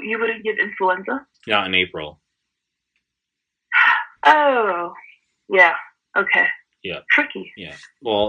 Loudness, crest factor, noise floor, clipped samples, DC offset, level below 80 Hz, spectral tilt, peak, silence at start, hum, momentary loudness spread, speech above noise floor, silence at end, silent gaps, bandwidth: -18 LUFS; 20 dB; -82 dBFS; under 0.1%; under 0.1%; -62 dBFS; -4.5 dB/octave; 0 dBFS; 0 s; none; 18 LU; 62 dB; 0 s; none; 9.4 kHz